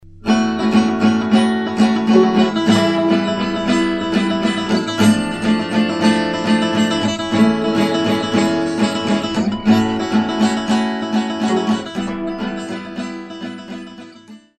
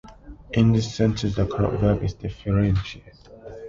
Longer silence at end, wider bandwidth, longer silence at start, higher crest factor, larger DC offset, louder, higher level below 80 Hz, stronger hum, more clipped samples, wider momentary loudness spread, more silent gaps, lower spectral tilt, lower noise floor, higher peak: first, 0.2 s vs 0 s; first, 12 kHz vs 7.6 kHz; about the same, 0.05 s vs 0.05 s; about the same, 16 dB vs 16 dB; neither; first, -17 LUFS vs -23 LUFS; second, -48 dBFS vs -38 dBFS; neither; neither; second, 10 LU vs 13 LU; neither; second, -5.5 dB/octave vs -7.5 dB/octave; about the same, -41 dBFS vs -42 dBFS; first, 0 dBFS vs -8 dBFS